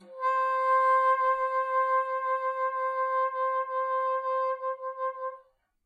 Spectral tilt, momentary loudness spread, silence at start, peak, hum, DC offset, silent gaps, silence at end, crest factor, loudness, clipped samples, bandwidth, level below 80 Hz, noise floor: -2 dB/octave; 10 LU; 0 s; -16 dBFS; none; under 0.1%; none; 0.45 s; 12 dB; -28 LUFS; under 0.1%; 7.8 kHz; -76 dBFS; -58 dBFS